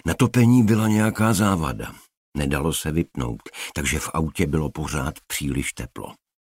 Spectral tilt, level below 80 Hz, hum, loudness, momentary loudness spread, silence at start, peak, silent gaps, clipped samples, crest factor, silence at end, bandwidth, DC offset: -5.5 dB/octave; -38 dBFS; none; -22 LUFS; 17 LU; 0.05 s; -6 dBFS; 2.17-2.32 s; under 0.1%; 16 dB; 0.3 s; 16 kHz; under 0.1%